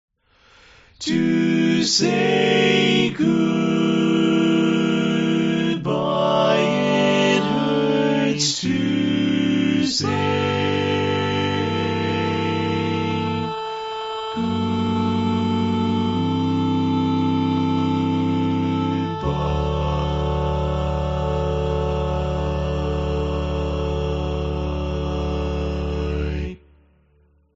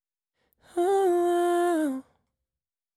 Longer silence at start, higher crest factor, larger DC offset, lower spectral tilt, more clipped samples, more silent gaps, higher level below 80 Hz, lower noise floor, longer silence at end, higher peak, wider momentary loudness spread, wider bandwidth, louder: first, 1 s vs 0.75 s; first, 18 dB vs 12 dB; neither; first, -5 dB/octave vs -3.5 dB/octave; neither; neither; first, -34 dBFS vs -76 dBFS; second, -58 dBFS vs under -90 dBFS; about the same, 1 s vs 0.95 s; first, -2 dBFS vs -16 dBFS; second, 7 LU vs 10 LU; second, 8 kHz vs 13.5 kHz; first, -21 LUFS vs -25 LUFS